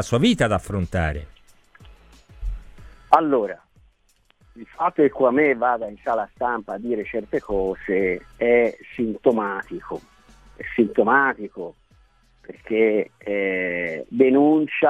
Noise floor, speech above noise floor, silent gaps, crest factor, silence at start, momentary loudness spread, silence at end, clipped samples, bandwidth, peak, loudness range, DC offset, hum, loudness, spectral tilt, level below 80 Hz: -62 dBFS; 41 dB; none; 22 dB; 0 s; 18 LU; 0 s; under 0.1%; 11.5 kHz; 0 dBFS; 3 LU; under 0.1%; none; -21 LUFS; -6.5 dB/octave; -42 dBFS